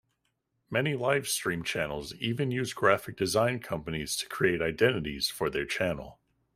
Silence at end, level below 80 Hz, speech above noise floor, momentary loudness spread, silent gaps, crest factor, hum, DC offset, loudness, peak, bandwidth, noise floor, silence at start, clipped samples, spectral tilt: 0.4 s; -56 dBFS; 49 dB; 8 LU; none; 22 dB; none; under 0.1%; -29 LUFS; -8 dBFS; 16 kHz; -78 dBFS; 0.7 s; under 0.1%; -4 dB/octave